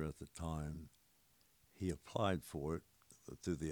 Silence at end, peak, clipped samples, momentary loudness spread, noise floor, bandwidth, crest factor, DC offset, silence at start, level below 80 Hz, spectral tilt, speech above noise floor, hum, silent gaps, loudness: 0 s; -22 dBFS; under 0.1%; 16 LU; -73 dBFS; over 20 kHz; 22 dB; under 0.1%; 0 s; -60 dBFS; -6 dB/octave; 31 dB; none; none; -44 LUFS